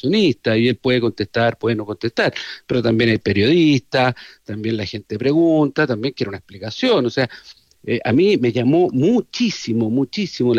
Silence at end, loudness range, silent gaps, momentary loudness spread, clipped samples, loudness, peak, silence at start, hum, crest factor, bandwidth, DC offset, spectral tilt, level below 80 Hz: 0 s; 2 LU; none; 10 LU; under 0.1%; -18 LUFS; -6 dBFS; 0.05 s; none; 12 dB; 8.2 kHz; under 0.1%; -6.5 dB/octave; -56 dBFS